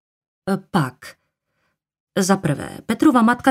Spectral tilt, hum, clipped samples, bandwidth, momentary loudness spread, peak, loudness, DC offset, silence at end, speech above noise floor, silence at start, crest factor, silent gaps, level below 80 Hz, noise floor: -5.5 dB/octave; none; under 0.1%; 16 kHz; 13 LU; -2 dBFS; -20 LUFS; under 0.1%; 0 s; 54 dB; 0.45 s; 18 dB; 2.00-2.07 s; -56 dBFS; -72 dBFS